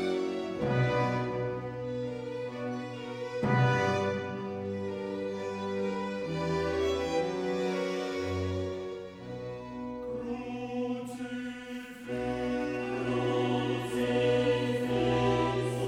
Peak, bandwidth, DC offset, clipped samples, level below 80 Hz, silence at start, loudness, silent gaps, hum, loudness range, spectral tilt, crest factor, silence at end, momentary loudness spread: -14 dBFS; 13.5 kHz; under 0.1%; under 0.1%; -56 dBFS; 0 s; -32 LUFS; none; none; 7 LU; -6.5 dB/octave; 18 dB; 0 s; 11 LU